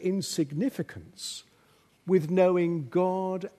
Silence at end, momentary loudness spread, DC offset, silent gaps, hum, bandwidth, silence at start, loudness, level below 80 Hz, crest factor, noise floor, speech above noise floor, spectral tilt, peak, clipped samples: 0.1 s; 15 LU; under 0.1%; none; none; 13.5 kHz; 0 s; -28 LUFS; -70 dBFS; 18 dB; -63 dBFS; 36 dB; -6 dB/octave; -10 dBFS; under 0.1%